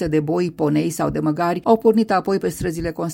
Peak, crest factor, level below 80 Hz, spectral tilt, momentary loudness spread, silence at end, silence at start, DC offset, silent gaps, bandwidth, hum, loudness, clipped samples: -2 dBFS; 16 dB; -44 dBFS; -6.5 dB/octave; 8 LU; 0 s; 0 s; under 0.1%; none; 16.5 kHz; none; -20 LUFS; under 0.1%